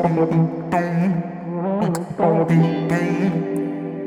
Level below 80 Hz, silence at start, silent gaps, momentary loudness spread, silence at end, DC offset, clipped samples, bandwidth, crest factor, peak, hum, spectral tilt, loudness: -56 dBFS; 0 s; none; 8 LU; 0 s; under 0.1%; under 0.1%; 12 kHz; 14 dB; -4 dBFS; none; -8.5 dB/octave; -20 LUFS